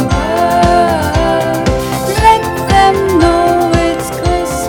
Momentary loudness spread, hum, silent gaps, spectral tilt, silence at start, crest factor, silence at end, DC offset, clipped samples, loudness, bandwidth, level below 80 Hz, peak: 6 LU; none; none; -5.5 dB/octave; 0 s; 10 dB; 0 s; under 0.1%; 0.5%; -11 LUFS; 19 kHz; -24 dBFS; 0 dBFS